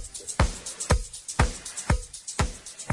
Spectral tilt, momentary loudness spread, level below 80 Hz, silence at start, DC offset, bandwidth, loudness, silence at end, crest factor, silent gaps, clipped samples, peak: -4 dB/octave; 7 LU; -32 dBFS; 0 s; under 0.1%; 11.5 kHz; -29 LUFS; 0 s; 22 dB; none; under 0.1%; -6 dBFS